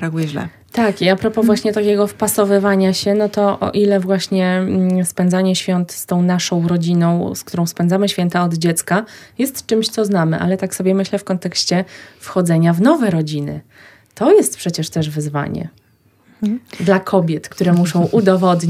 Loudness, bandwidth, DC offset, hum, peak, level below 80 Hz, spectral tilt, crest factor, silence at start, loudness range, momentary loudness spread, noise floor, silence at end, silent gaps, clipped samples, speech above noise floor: -16 LUFS; 15.5 kHz; under 0.1%; none; 0 dBFS; -56 dBFS; -5.5 dB/octave; 16 dB; 0 s; 3 LU; 9 LU; -53 dBFS; 0 s; none; under 0.1%; 38 dB